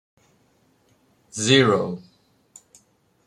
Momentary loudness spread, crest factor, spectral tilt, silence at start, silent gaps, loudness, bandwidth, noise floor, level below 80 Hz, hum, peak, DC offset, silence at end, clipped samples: 20 LU; 22 dB; -4 dB/octave; 1.35 s; none; -19 LUFS; 12 kHz; -62 dBFS; -64 dBFS; none; -2 dBFS; under 0.1%; 1.3 s; under 0.1%